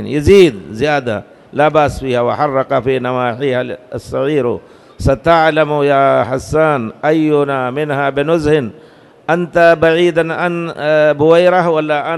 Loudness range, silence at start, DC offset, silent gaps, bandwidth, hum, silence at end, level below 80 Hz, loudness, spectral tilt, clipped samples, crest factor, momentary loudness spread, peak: 3 LU; 0 s; under 0.1%; none; 12.5 kHz; none; 0 s; -36 dBFS; -13 LUFS; -6.5 dB/octave; 0.2%; 12 dB; 10 LU; 0 dBFS